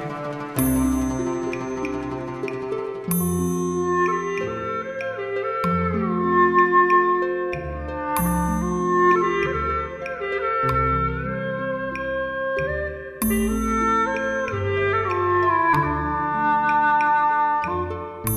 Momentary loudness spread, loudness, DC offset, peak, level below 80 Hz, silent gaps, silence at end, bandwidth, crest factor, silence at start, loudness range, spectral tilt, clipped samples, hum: 10 LU; -22 LUFS; under 0.1%; -6 dBFS; -38 dBFS; none; 0 s; 15.5 kHz; 16 dB; 0 s; 5 LU; -6 dB/octave; under 0.1%; none